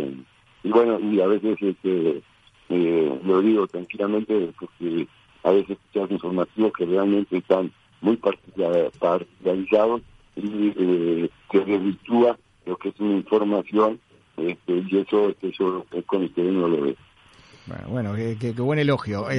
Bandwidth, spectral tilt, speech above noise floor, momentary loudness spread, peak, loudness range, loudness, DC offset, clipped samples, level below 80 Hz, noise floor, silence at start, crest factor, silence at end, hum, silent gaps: 9.4 kHz; -8.5 dB/octave; 30 dB; 10 LU; -4 dBFS; 2 LU; -23 LUFS; under 0.1%; under 0.1%; -62 dBFS; -52 dBFS; 0 s; 20 dB; 0 s; none; none